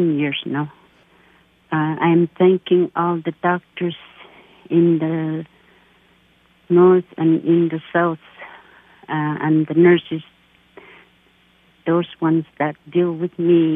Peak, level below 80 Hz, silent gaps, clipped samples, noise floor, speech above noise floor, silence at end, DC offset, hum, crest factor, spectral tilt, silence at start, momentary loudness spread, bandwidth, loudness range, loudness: -2 dBFS; -66 dBFS; none; under 0.1%; -56 dBFS; 39 dB; 0 s; under 0.1%; none; 16 dB; -10.5 dB/octave; 0 s; 15 LU; 3.8 kHz; 4 LU; -18 LUFS